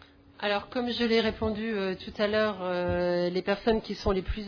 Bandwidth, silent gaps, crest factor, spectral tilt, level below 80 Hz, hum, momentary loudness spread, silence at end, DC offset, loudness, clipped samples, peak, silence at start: 5.4 kHz; none; 16 dB; -6.5 dB/octave; -44 dBFS; none; 5 LU; 0 s; under 0.1%; -29 LUFS; under 0.1%; -12 dBFS; 0.4 s